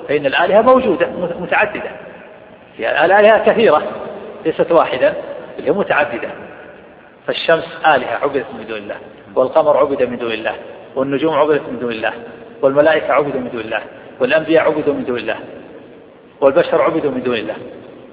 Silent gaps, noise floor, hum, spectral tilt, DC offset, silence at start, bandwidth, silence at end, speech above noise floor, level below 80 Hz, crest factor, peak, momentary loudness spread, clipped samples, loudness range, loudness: none; -41 dBFS; none; -8.5 dB/octave; under 0.1%; 0 s; 5 kHz; 0 s; 26 dB; -54 dBFS; 16 dB; 0 dBFS; 17 LU; under 0.1%; 4 LU; -15 LUFS